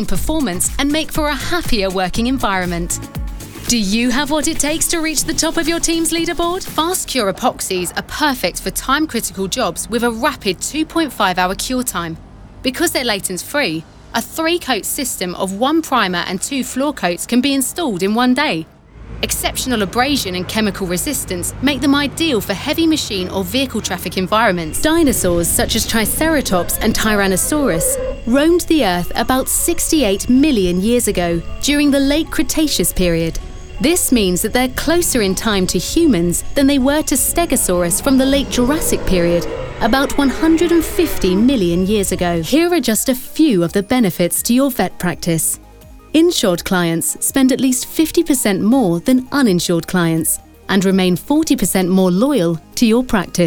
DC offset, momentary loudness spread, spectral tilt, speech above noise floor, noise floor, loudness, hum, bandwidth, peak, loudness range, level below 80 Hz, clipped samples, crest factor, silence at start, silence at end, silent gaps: under 0.1%; 6 LU; -4 dB/octave; 24 dB; -39 dBFS; -16 LUFS; none; over 20 kHz; -2 dBFS; 3 LU; -32 dBFS; under 0.1%; 14 dB; 0 s; 0 s; none